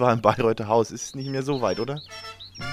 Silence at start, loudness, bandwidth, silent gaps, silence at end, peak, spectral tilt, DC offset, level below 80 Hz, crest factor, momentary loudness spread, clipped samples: 0 s; -25 LUFS; 15 kHz; none; 0 s; -2 dBFS; -5.5 dB/octave; under 0.1%; -54 dBFS; 22 dB; 16 LU; under 0.1%